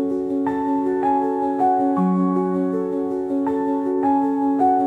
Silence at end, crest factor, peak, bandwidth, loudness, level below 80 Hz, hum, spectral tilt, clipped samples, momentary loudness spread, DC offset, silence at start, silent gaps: 0 s; 12 dB; -8 dBFS; 4 kHz; -21 LUFS; -60 dBFS; none; -10 dB/octave; under 0.1%; 4 LU; under 0.1%; 0 s; none